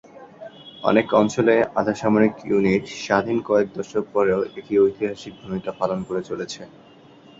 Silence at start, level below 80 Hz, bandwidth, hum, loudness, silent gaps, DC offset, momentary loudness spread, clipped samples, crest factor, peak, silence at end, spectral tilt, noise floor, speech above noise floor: 0.15 s; -56 dBFS; 7.8 kHz; none; -21 LUFS; none; under 0.1%; 14 LU; under 0.1%; 20 dB; -2 dBFS; 0.7 s; -6 dB/octave; -48 dBFS; 27 dB